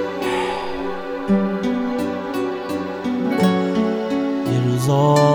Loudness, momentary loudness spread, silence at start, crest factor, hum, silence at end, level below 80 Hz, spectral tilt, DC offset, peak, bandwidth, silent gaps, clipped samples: -20 LUFS; 8 LU; 0 s; 16 dB; none; 0 s; -50 dBFS; -7 dB/octave; under 0.1%; -2 dBFS; over 20 kHz; none; under 0.1%